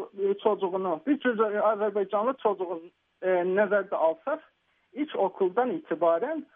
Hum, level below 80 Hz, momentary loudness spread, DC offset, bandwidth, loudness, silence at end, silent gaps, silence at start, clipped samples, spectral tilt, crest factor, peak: none; -84 dBFS; 9 LU; under 0.1%; 3.8 kHz; -27 LUFS; 0.1 s; none; 0 s; under 0.1%; -4.5 dB/octave; 16 dB; -12 dBFS